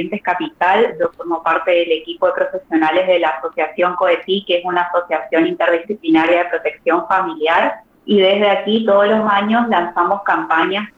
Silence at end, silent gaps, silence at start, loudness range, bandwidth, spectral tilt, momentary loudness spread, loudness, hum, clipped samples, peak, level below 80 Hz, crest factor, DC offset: 0.1 s; none; 0 s; 2 LU; 7.6 kHz; -6.5 dB/octave; 7 LU; -16 LUFS; none; under 0.1%; -4 dBFS; -60 dBFS; 12 dB; under 0.1%